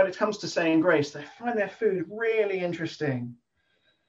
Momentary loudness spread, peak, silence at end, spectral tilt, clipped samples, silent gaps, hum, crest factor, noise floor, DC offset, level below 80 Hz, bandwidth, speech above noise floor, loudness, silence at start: 11 LU; -10 dBFS; 0.75 s; -5.5 dB/octave; under 0.1%; none; none; 18 dB; -70 dBFS; under 0.1%; -72 dBFS; 7.8 kHz; 43 dB; -27 LUFS; 0 s